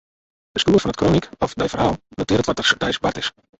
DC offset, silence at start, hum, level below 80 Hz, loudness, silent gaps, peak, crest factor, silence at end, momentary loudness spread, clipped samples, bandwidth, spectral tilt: under 0.1%; 0.55 s; none; -42 dBFS; -20 LUFS; none; -2 dBFS; 18 dB; 0.3 s; 9 LU; under 0.1%; 8.2 kHz; -5 dB/octave